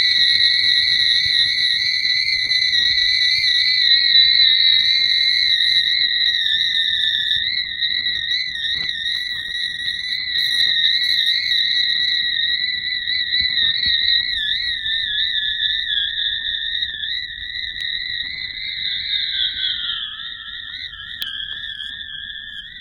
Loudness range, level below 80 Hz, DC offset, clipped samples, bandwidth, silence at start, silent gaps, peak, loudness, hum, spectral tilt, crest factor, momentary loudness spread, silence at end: 10 LU; -50 dBFS; under 0.1%; under 0.1%; 16 kHz; 0 s; none; -2 dBFS; -16 LUFS; none; 1 dB/octave; 18 dB; 14 LU; 0 s